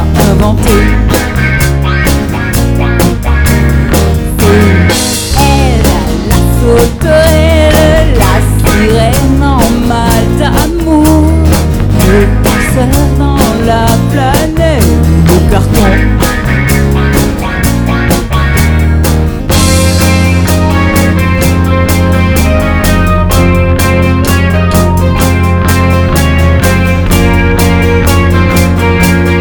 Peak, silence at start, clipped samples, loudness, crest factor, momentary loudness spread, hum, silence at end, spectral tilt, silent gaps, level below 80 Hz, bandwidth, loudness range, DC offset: 0 dBFS; 0 s; 2%; -8 LUFS; 6 dB; 3 LU; none; 0 s; -5.5 dB/octave; none; -12 dBFS; over 20 kHz; 2 LU; under 0.1%